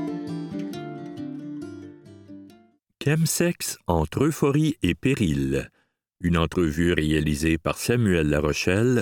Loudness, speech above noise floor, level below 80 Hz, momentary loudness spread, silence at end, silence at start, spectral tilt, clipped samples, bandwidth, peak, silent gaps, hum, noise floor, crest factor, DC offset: -24 LUFS; 34 dB; -40 dBFS; 14 LU; 0 s; 0 s; -5.5 dB/octave; under 0.1%; 19 kHz; -6 dBFS; none; none; -57 dBFS; 20 dB; under 0.1%